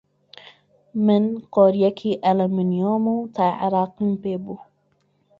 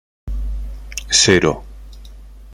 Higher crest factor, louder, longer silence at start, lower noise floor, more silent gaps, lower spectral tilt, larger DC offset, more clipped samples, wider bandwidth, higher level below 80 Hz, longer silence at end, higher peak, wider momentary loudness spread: about the same, 18 dB vs 20 dB; second, -21 LUFS vs -15 LUFS; first, 0.95 s vs 0.25 s; first, -65 dBFS vs -37 dBFS; neither; first, -9.5 dB/octave vs -3 dB/octave; neither; neither; second, 5.2 kHz vs 16 kHz; second, -64 dBFS vs -30 dBFS; first, 0.75 s vs 0 s; second, -4 dBFS vs 0 dBFS; second, 11 LU vs 19 LU